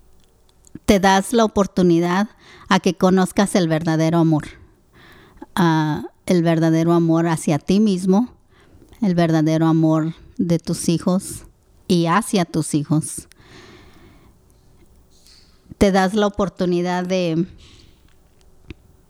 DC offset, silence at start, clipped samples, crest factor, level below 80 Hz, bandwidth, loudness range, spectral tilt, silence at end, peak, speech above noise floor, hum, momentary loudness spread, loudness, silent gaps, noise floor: under 0.1%; 0.9 s; under 0.1%; 18 dB; -46 dBFS; 15.5 kHz; 6 LU; -6 dB/octave; 1.6 s; 0 dBFS; 35 dB; none; 9 LU; -18 LUFS; none; -53 dBFS